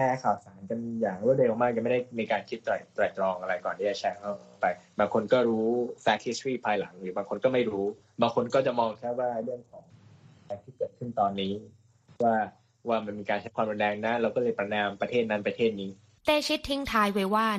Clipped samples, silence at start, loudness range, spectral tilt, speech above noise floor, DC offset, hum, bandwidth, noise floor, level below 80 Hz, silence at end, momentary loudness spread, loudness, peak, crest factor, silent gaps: under 0.1%; 0 s; 4 LU; -5.5 dB/octave; 27 dB; under 0.1%; none; 13.5 kHz; -55 dBFS; -62 dBFS; 0 s; 10 LU; -29 LUFS; -10 dBFS; 18 dB; none